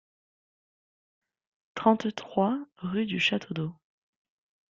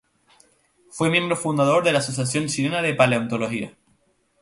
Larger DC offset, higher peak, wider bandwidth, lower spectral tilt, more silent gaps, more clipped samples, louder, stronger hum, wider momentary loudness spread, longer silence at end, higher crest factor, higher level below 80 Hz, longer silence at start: neither; second, -8 dBFS vs -2 dBFS; second, 7.6 kHz vs 11.5 kHz; first, -6 dB/octave vs -4.5 dB/octave; neither; neither; second, -28 LUFS vs -21 LUFS; neither; about the same, 10 LU vs 9 LU; first, 1 s vs 0.7 s; about the same, 24 dB vs 20 dB; second, -70 dBFS vs -60 dBFS; first, 1.75 s vs 0.95 s